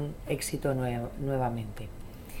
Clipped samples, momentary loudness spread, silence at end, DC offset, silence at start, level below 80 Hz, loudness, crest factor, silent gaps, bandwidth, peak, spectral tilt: under 0.1%; 14 LU; 0 s; under 0.1%; 0 s; -44 dBFS; -32 LUFS; 16 dB; none; 17.5 kHz; -16 dBFS; -6 dB/octave